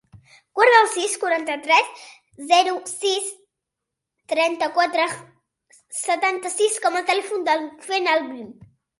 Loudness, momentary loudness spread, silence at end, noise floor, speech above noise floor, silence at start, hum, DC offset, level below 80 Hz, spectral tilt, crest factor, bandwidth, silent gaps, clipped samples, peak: -20 LUFS; 15 LU; 0.45 s; -84 dBFS; 63 dB; 0.55 s; none; under 0.1%; -72 dBFS; -1 dB/octave; 22 dB; 11.5 kHz; none; under 0.1%; -2 dBFS